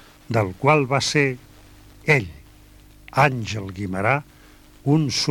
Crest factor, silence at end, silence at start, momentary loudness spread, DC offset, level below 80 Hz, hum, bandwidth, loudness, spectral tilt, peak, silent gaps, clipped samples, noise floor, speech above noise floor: 18 dB; 0 s; 0.3 s; 11 LU; under 0.1%; -50 dBFS; none; 17.5 kHz; -21 LUFS; -5 dB/octave; -4 dBFS; none; under 0.1%; -48 dBFS; 28 dB